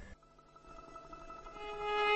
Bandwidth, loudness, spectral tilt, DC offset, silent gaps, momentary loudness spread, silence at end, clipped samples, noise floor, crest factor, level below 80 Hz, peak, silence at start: 8.2 kHz; -42 LUFS; -3 dB/octave; under 0.1%; none; 23 LU; 0 s; under 0.1%; -62 dBFS; 18 dB; -60 dBFS; -22 dBFS; 0 s